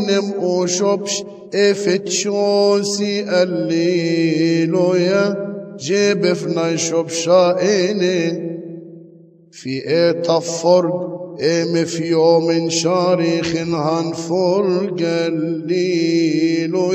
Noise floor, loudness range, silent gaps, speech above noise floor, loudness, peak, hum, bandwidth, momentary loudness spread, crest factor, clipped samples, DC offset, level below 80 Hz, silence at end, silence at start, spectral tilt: -45 dBFS; 2 LU; none; 29 dB; -17 LUFS; -2 dBFS; none; 9.2 kHz; 7 LU; 16 dB; under 0.1%; under 0.1%; -64 dBFS; 0 s; 0 s; -5 dB/octave